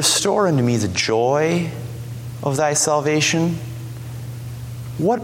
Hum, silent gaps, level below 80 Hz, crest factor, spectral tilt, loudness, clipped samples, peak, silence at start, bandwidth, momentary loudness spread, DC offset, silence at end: none; none; -48 dBFS; 16 dB; -4 dB/octave; -19 LUFS; under 0.1%; -4 dBFS; 0 s; 17 kHz; 15 LU; under 0.1%; 0 s